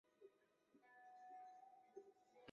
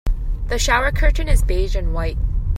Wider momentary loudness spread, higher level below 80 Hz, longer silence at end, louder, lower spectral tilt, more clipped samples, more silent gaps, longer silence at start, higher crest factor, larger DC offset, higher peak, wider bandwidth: about the same, 6 LU vs 8 LU; second, under -90 dBFS vs -18 dBFS; about the same, 0 s vs 0 s; second, -64 LUFS vs -21 LUFS; second, -2.5 dB/octave vs -4.5 dB/octave; neither; neither; about the same, 0.05 s vs 0.05 s; about the same, 20 dB vs 16 dB; neither; second, -46 dBFS vs -2 dBFS; second, 7.2 kHz vs 13 kHz